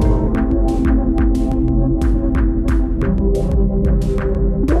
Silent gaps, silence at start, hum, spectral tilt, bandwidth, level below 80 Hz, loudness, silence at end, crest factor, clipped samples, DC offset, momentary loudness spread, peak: none; 0 s; none; -9 dB/octave; 7.8 kHz; -16 dBFS; -17 LUFS; 0 s; 12 dB; under 0.1%; under 0.1%; 2 LU; -2 dBFS